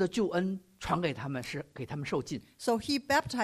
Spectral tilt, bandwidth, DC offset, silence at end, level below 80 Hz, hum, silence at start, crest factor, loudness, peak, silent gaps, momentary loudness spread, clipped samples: -5 dB/octave; 15.5 kHz; under 0.1%; 0 s; -58 dBFS; none; 0 s; 18 dB; -33 LUFS; -14 dBFS; none; 11 LU; under 0.1%